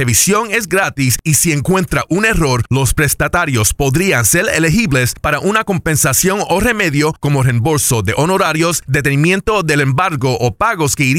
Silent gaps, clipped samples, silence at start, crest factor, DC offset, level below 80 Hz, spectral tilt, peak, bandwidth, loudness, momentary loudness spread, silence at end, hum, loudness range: none; under 0.1%; 0 s; 12 dB; under 0.1%; -30 dBFS; -4 dB/octave; -2 dBFS; 17 kHz; -13 LUFS; 4 LU; 0 s; none; 1 LU